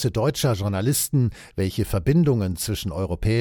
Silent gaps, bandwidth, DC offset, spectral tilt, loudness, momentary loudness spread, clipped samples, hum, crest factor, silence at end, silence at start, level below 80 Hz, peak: none; 17.5 kHz; under 0.1%; -5.5 dB/octave; -23 LUFS; 7 LU; under 0.1%; none; 16 dB; 0 s; 0 s; -38 dBFS; -6 dBFS